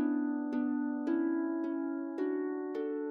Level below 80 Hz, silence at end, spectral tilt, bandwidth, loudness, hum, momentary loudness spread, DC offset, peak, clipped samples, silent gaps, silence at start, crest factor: -88 dBFS; 0 s; -7.5 dB/octave; 4.4 kHz; -34 LUFS; none; 4 LU; under 0.1%; -22 dBFS; under 0.1%; none; 0 s; 12 dB